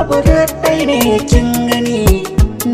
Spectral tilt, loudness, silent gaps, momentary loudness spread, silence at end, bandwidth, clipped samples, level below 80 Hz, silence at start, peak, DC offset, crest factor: -5.5 dB/octave; -13 LUFS; none; 3 LU; 0 s; 16 kHz; under 0.1%; -18 dBFS; 0 s; 0 dBFS; under 0.1%; 12 dB